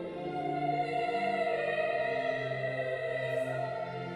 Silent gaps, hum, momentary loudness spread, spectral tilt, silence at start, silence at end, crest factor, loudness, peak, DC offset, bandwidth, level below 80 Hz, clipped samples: none; none; 5 LU; -6.5 dB/octave; 0 s; 0 s; 14 dB; -33 LUFS; -20 dBFS; under 0.1%; 11.5 kHz; -70 dBFS; under 0.1%